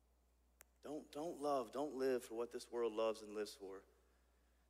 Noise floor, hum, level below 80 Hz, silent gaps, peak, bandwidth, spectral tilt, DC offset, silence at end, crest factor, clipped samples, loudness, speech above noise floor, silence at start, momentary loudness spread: -76 dBFS; none; -76 dBFS; none; -30 dBFS; 15.5 kHz; -4.5 dB/octave; under 0.1%; 0.85 s; 16 dB; under 0.1%; -44 LUFS; 32 dB; 0.85 s; 13 LU